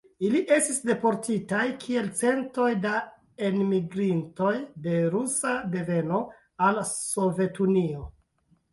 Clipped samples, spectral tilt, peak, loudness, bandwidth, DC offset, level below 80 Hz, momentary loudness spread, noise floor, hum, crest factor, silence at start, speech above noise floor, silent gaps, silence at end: under 0.1%; -5 dB/octave; -8 dBFS; -26 LUFS; 12 kHz; under 0.1%; -58 dBFS; 6 LU; -67 dBFS; none; 18 dB; 0.2 s; 42 dB; none; 0.65 s